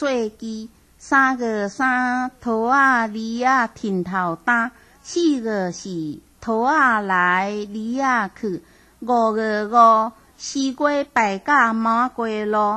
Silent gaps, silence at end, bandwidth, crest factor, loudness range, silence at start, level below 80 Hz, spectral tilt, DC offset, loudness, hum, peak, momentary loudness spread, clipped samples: none; 0 s; 12.5 kHz; 18 dB; 3 LU; 0 s; -58 dBFS; -4.5 dB/octave; under 0.1%; -20 LUFS; none; -4 dBFS; 13 LU; under 0.1%